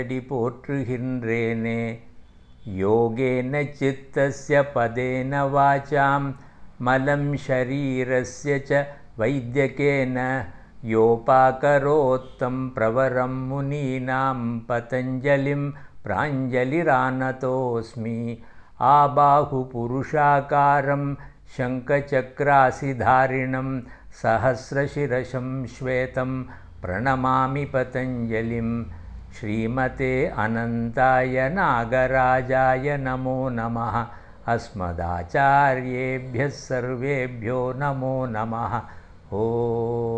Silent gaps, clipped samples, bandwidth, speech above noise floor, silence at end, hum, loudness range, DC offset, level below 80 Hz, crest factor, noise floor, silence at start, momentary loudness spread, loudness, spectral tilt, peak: none; under 0.1%; 8.8 kHz; 24 dB; 0 s; none; 5 LU; 0.1%; -46 dBFS; 18 dB; -46 dBFS; 0 s; 10 LU; -23 LUFS; -7.5 dB/octave; -4 dBFS